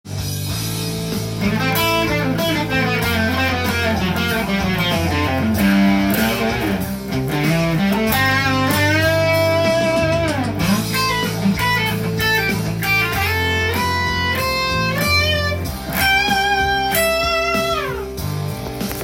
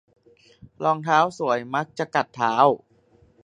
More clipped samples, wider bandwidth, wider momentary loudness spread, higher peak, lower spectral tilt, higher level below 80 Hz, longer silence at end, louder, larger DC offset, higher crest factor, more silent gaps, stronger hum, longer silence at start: neither; first, 17 kHz vs 10 kHz; about the same, 8 LU vs 8 LU; about the same, -4 dBFS vs -4 dBFS; about the same, -4.5 dB/octave vs -5.5 dB/octave; first, -36 dBFS vs -68 dBFS; second, 0 s vs 0.65 s; first, -18 LUFS vs -22 LUFS; neither; second, 14 dB vs 20 dB; neither; neither; second, 0.05 s vs 0.8 s